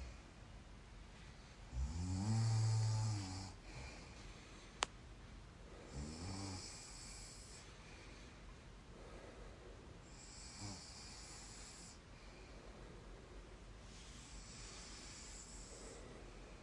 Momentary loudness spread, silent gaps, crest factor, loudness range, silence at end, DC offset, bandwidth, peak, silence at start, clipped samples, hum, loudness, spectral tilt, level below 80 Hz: 18 LU; none; 32 dB; 14 LU; 0 s; under 0.1%; 11.5 kHz; -16 dBFS; 0 s; under 0.1%; none; -48 LUFS; -4.5 dB/octave; -58 dBFS